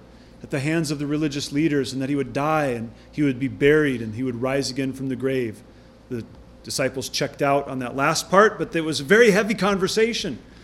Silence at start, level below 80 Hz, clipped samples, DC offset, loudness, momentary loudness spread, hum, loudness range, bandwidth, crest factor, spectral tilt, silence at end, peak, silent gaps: 0.35 s; -50 dBFS; under 0.1%; under 0.1%; -22 LUFS; 14 LU; none; 7 LU; 15.5 kHz; 20 dB; -5 dB/octave; 0.05 s; -2 dBFS; none